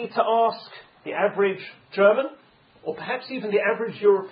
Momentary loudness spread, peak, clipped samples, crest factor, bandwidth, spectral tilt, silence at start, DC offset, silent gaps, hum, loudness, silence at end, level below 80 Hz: 16 LU; -4 dBFS; under 0.1%; 18 dB; 5.2 kHz; -9.5 dB/octave; 0 s; under 0.1%; none; none; -23 LUFS; 0 s; -78 dBFS